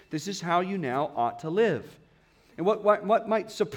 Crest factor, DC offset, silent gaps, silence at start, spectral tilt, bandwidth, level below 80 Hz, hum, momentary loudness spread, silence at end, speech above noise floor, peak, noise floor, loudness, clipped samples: 18 dB; under 0.1%; none; 0.1 s; -5.5 dB/octave; 17 kHz; -70 dBFS; none; 7 LU; 0 s; 34 dB; -10 dBFS; -60 dBFS; -27 LUFS; under 0.1%